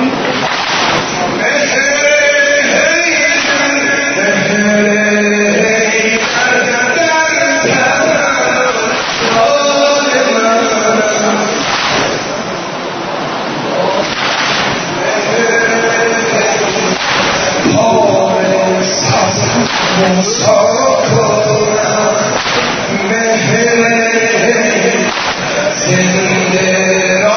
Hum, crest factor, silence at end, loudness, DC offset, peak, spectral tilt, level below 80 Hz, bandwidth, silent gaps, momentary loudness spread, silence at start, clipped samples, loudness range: none; 12 dB; 0 s; -11 LUFS; under 0.1%; 0 dBFS; -3 dB/octave; -46 dBFS; 6.6 kHz; none; 4 LU; 0 s; under 0.1%; 3 LU